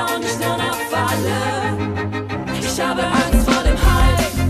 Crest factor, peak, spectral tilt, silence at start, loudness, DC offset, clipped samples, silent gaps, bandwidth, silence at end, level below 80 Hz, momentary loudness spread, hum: 14 dB; -2 dBFS; -5 dB/octave; 0 s; -19 LUFS; under 0.1%; under 0.1%; none; 14.5 kHz; 0 s; -22 dBFS; 7 LU; none